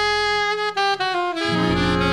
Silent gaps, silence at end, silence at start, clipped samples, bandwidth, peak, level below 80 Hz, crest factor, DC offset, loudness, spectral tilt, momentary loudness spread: none; 0 s; 0 s; under 0.1%; 11.5 kHz; -8 dBFS; -40 dBFS; 14 dB; 0.2%; -20 LUFS; -4.5 dB/octave; 3 LU